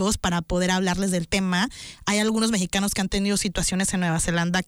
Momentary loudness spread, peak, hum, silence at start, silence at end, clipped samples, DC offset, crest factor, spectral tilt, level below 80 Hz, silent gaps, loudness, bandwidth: 3 LU; -12 dBFS; none; 0 s; 0.05 s; under 0.1%; under 0.1%; 12 dB; -4 dB/octave; -40 dBFS; none; -23 LUFS; 19.5 kHz